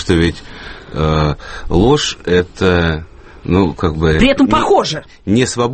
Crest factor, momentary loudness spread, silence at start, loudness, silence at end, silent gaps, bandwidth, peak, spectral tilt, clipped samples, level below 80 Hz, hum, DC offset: 14 dB; 14 LU; 0 s; -14 LUFS; 0 s; none; 8.8 kHz; 0 dBFS; -5.5 dB/octave; under 0.1%; -28 dBFS; none; under 0.1%